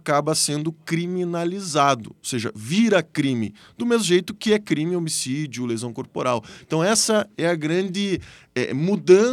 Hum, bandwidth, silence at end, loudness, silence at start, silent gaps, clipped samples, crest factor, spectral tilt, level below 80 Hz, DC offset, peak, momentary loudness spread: none; 15.5 kHz; 0 s; -22 LUFS; 0.05 s; none; under 0.1%; 20 dB; -4.5 dB/octave; -62 dBFS; under 0.1%; -2 dBFS; 9 LU